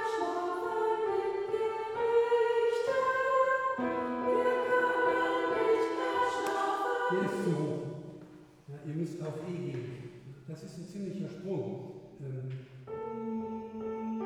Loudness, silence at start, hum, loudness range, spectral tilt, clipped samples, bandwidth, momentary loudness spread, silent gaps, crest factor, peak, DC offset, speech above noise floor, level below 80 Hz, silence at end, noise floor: -32 LUFS; 0 s; none; 11 LU; -6 dB/octave; under 0.1%; 13 kHz; 17 LU; none; 16 dB; -16 dBFS; under 0.1%; 18 dB; -70 dBFS; 0 s; -53 dBFS